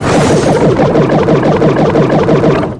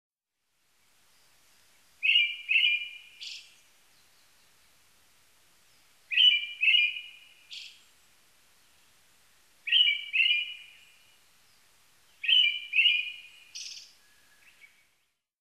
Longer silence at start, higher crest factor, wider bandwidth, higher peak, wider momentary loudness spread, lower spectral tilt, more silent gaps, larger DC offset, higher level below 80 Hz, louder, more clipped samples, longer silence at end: second, 0 s vs 2 s; second, 8 dB vs 20 dB; second, 10.5 kHz vs 14.5 kHz; first, 0 dBFS vs -12 dBFS; second, 1 LU vs 24 LU; first, -7 dB/octave vs 4.5 dB/octave; neither; neither; first, -30 dBFS vs -84 dBFS; first, -9 LUFS vs -23 LUFS; first, 0.3% vs under 0.1%; second, 0 s vs 1.6 s